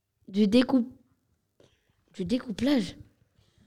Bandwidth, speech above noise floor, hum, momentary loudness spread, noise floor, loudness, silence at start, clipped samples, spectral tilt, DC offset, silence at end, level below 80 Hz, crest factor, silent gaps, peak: 13 kHz; 47 dB; none; 15 LU; -72 dBFS; -27 LUFS; 0.3 s; under 0.1%; -6 dB/octave; under 0.1%; 0.7 s; -60 dBFS; 20 dB; none; -10 dBFS